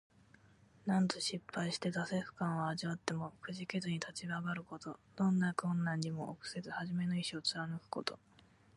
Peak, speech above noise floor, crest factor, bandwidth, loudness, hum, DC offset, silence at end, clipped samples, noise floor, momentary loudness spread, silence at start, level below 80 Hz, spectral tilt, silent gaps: -16 dBFS; 27 dB; 24 dB; 11.5 kHz; -39 LUFS; none; under 0.1%; 0.6 s; under 0.1%; -66 dBFS; 10 LU; 0.85 s; -76 dBFS; -5 dB/octave; none